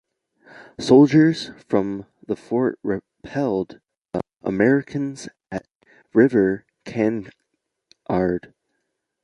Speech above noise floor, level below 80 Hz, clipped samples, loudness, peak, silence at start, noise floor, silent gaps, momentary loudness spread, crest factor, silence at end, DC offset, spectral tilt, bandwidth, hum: 57 dB; -56 dBFS; under 0.1%; -21 LUFS; -2 dBFS; 0.6 s; -76 dBFS; none; 18 LU; 20 dB; 0.85 s; under 0.1%; -7 dB/octave; 11 kHz; none